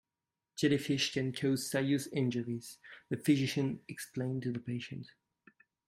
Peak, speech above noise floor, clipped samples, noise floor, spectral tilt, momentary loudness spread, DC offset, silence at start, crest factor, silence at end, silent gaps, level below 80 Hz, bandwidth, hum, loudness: -16 dBFS; over 56 dB; under 0.1%; under -90 dBFS; -5.5 dB/octave; 15 LU; under 0.1%; 0.55 s; 18 dB; 0.8 s; none; -72 dBFS; 16 kHz; none; -34 LUFS